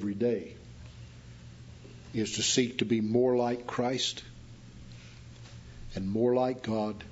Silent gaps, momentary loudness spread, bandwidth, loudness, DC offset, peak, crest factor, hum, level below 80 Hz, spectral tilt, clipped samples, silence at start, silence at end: none; 23 LU; 8 kHz; -30 LUFS; under 0.1%; -12 dBFS; 20 dB; none; -54 dBFS; -4.5 dB/octave; under 0.1%; 0 s; 0 s